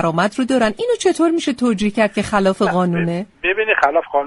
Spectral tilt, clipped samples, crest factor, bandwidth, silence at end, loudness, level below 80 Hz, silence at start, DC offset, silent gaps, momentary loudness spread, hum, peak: -5.5 dB/octave; under 0.1%; 16 dB; 11.5 kHz; 0 s; -17 LUFS; -48 dBFS; 0 s; under 0.1%; none; 4 LU; none; 0 dBFS